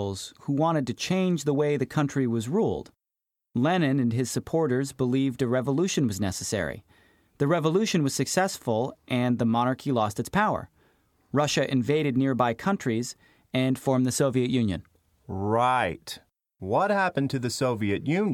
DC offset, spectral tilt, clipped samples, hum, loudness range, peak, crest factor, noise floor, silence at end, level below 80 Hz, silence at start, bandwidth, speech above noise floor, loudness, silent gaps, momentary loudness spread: under 0.1%; -5.5 dB/octave; under 0.1%; none; 1 LU; -10 dBFS; 16 dB; -87 dBFS; 0 s; -58 dBFS; 0 s; 16 kHz; 62 dB; -26 LUFS; none; 7 LU